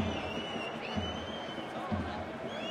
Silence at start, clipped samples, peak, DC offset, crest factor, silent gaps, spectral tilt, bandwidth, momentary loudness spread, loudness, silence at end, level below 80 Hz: 0 s; under 0.1%; -20 dBFS; under 0.1%; 16 dB; none; -5.5 dB/octave; 13 kHz; 3 LU; -37 LUFS; 0 s; -58 dBFS